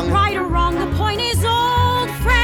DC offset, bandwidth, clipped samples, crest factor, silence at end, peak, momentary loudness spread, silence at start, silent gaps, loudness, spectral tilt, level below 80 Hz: under 0.1%; 17.5 kHz; under 0.1%; 14 dB; 0 s; -2 dBFS; 3 LU; 0 s; none; -18 LUFS; -5 dB/octave; -26 dBFS